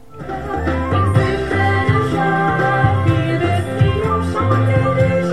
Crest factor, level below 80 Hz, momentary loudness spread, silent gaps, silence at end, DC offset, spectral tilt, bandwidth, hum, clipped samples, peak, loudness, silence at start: 14 dB; -32 dBFS; 5 LU; none; 0 s; 1%; -7.5 dB/octave; 11.5 kHz; none; under 0.1%; -2 dBFS; -16 LUFS; 0.15 s